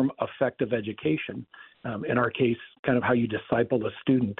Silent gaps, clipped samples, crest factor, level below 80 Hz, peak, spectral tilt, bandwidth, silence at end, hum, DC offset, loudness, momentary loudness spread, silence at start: 2.79-2.83 s; under 0.1%; 18 dB; -62 dBFS; -10 dBFS; -5.5 dB/octave; 4.1 kHz; 0.05 s; none; under 0.1%; -27 LUFS; 12 LU; 0 s